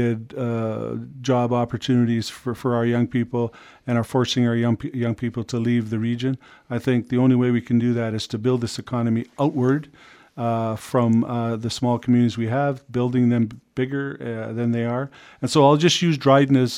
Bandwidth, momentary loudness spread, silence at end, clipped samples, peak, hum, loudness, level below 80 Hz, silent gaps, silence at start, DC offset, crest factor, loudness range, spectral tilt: 14.5 kHz; 10 LU; 0 s; under 0.1%; -2 dBFS; none; -22 LUFS; -58 dBFS; none; 0 s; under 0.1%; 20 dB; 2 LU; -6.5 dB/octave